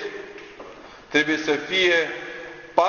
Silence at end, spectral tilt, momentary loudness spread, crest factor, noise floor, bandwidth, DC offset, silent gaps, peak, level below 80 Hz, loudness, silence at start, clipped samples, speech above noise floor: 0 s; -3 dB/octave; 22 LU; 22 dB; -43 dBFS; 7.2 kHz; under 0.1%; none; -2 dBFS; -60 dBFS; -22 LUFS; 0 s; under 0.1%; 21 dB